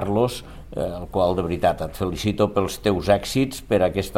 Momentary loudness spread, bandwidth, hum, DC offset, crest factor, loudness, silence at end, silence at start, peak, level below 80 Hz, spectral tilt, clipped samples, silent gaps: 8 LU; 16.5 kHz; none; under 0.1%; 18 dB; -23 LUFS; 0 s; 0 s; -4 dBFS; -40 dBFS; -6 dB/octave; under 0.1%; none